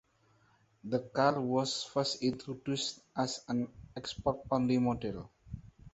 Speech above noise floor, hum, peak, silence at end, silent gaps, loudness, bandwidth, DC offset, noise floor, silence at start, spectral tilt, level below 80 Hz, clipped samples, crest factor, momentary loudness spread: 35 dB; none; -14 dBFS; 0.05 s; none; -34 LUFS; 8.2 kHz; under 0.1%; -69 dBFS; 0.85 s; -5 dB/octave; -60 dBFS; under 0.1%; 22 dB; 17 LU